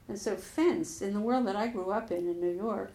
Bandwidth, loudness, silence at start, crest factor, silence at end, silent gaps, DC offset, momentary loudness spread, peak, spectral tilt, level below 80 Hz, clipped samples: 15 kHz; -32 LUFS; 0.1 s; 16 dB; 0 s; none; under 0.1%; 6 LU; -16 dBFS; -5.5 dB/octave; -62 dBFS; under 0.1%